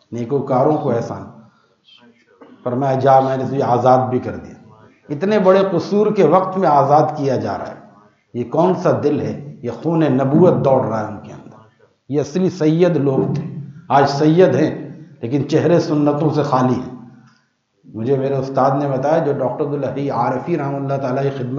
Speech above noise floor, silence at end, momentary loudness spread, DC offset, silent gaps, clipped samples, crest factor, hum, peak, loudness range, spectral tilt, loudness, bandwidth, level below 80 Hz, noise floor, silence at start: 46 dB; 0 s; 15 LU; under 0.1%; none; under 0.1%; 16 dB; none; 0 dBFS; 3 LU; -8 dB/octave; -17 LUFS; 7.4 kHz; -62 dBFS; -62 dBFS; 0.1 s